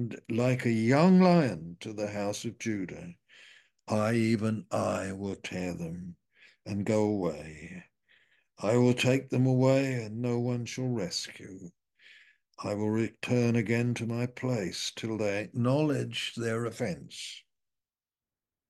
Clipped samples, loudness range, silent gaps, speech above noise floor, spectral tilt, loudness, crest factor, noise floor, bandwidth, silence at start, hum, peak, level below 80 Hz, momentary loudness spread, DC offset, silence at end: under 0.1%; 6 LU; none; over 61 dB; -6 dB/octave; -29 LUFS; 20 dB; under -90 dBFS; 12.5 kHz; 0 s; none; -10 dBFS; -66 dBFS; 16 LU; under 0.1%; 1.3 s